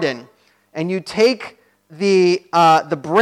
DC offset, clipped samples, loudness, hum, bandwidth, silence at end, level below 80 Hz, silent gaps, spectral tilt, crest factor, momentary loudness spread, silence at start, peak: under 0.1%; under 0.1%; -17 LUFS; none; 13.5 kHz; 0 s; -66 dBFS; none; -5 dB/octave; 14 dB; 17 LU; 0 s; -4 dBFS